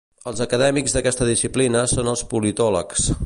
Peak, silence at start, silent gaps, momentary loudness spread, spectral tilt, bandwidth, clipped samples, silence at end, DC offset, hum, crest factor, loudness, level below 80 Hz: -6 dBFS; 0.25 s; none; 5 LU; -4 dB/octave; 11.5 kHz; under 0.1%; 0 s; under 0.1%; none; 14 dB; -20 LUFS; -36 dBFS